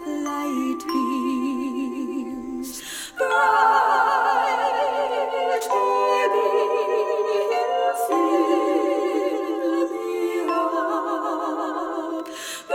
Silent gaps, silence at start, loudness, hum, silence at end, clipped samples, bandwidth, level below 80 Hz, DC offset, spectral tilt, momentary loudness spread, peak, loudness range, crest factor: none; 0 s; -22 LUFS; none; 0 s; under 0.1%; 17.5 kHz; -62 dBFS; under 0.1%; -2.5 dB/octave; 10 LU; -6 dBFS; 5 LU; 16 dB